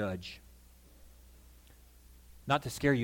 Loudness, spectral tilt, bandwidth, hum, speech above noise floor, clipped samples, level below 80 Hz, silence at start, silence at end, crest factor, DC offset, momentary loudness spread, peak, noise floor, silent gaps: -34 LUFS; -5.5 dB/octave; 17.5 kHz; 60 Hz at -60 dBFS; 26 dB; under 0.1%; -56 dBFS; 0 s; 0 s; 24 dB; under 0.1%; 28 LU; -14 dBFS; -58 dBFS; none